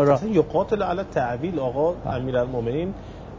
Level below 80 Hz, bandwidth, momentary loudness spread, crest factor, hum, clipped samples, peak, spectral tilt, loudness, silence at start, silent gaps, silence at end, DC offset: -44 dBFS; 7.6 kHz; 7 LU; 18 dB; none; under 0.1%; -6 dBFS; -8 dB/octave; -24 LUFS; 0 s; none; 0 s; under 0.1%